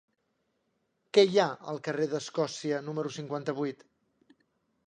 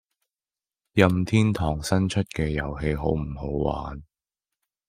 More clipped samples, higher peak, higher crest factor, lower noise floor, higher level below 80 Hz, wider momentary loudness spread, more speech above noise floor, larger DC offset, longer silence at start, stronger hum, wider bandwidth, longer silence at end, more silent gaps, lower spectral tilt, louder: neither; second, -8 dBFS vs -2 dBFS; about the same, 24 dB vs 24 dB; second, -77 dBFS vs under -90 dBFS; second, -82 dBFS vs -40 dBFS; about the same, 11 LU vs 9 LU; second, 48 dB vs over 66 dB; neither; first, 1.15 s vs 0.95 s; neither; second, 9.6 kHz vs 15.5 kHz; first, 1.15 s vs 0.85 s; neither; second, -5 dB/octave vs -6.5 dB/octave; second, -30 LUFS vs -25 LUFS